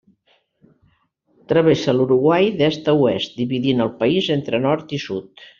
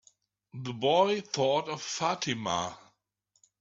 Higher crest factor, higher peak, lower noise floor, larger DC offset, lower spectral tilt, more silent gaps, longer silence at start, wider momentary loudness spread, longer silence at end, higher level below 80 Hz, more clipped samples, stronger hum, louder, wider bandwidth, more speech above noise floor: about the same, 16 dB vs 20 dB; first, -2 dBFS vs -12 dBFS; second, -63 dBFS vs -75 dBFS; neither; about the same, -5 dB/octave vs -4 dB/octave; neither; first, 1.5 s vs 0.55 s; second, 8 LU vs 14 LU; second, 0.15 s vs 0.85 s; first, -58 dBFS vs -72 dBFS; neither; neither; first, -18 LUFS vs -29 LUFS; about the same, 7.4 kHz vs 8 kHz; about the same, 45 dB vs 46 dB